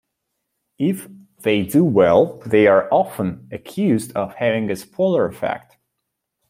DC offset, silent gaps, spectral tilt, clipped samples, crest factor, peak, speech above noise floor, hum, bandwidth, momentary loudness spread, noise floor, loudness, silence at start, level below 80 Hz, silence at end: under 0.1%; none; -6.5 dB/octave; under 0.1%; 18 dB; -2 dBFS; 60 dB; none; 16.5 kHz; 12 LU; -78 dBFS; -18 LUFS; 0.8 s; -58 dBFS; 0.9 s